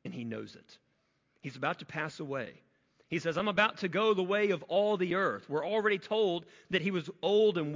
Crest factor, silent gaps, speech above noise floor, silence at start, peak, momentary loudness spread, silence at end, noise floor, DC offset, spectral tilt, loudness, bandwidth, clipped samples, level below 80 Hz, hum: 20 dB; none; 43 dB; 0.05 s; -12 dBFS; 12 LU; 0 s; -75 dBFS; under 0.1%; -6 dB/octave; -31 LUFS; 7.6 kHz; under 0.1%; -74 dBFS; none